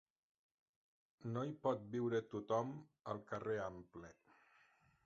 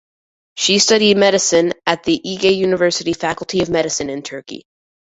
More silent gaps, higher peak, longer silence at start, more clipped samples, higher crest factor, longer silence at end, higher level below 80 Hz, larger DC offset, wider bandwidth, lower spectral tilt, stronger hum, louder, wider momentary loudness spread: neither; second, -26 dBFS vs -2 dBFS; first, 1.25 s vs 0.55 s; neither; about the same, 20 dB vs 16 dB; first, 0.95 s vs 0.5 s; second, -76 dBFS vs -52 dBFS; neither; about the same, 7.6 kHz vs 8.2 kHz; first, -6.5 dB/octave vs -3 dB/octave; neither; second, -43 LUFS vs -15 LUFS; about the same, 15 LU vs 17 LU